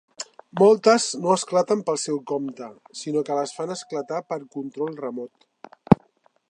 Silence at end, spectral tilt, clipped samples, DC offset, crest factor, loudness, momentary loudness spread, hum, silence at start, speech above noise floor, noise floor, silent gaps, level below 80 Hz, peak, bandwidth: 0.55 s; -5 dB/octave; under 0.1%; under 0.1%; 24 dB; -23 LUFS; 18 LU; none; 0.2 s; 39 dB; -62 dBFS; none; -56 dBFS; 0 dBFS; 11 kHz